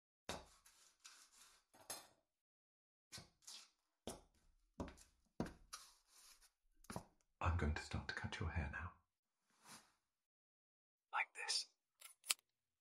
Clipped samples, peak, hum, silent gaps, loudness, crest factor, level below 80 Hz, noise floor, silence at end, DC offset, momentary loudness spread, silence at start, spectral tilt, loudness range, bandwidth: under 0.1%; -18 dBFS; none; 2.41-3.11 s, 9.19-9.23 s, 10.26-10.98 s; -48 LUFS; 34 dB; -60 dBFS; -77 dBFS; 0.45 s; under 0.1%; 23 LU; 0.3 s; -3.5 dB/octave; 11 LU; 15 kHz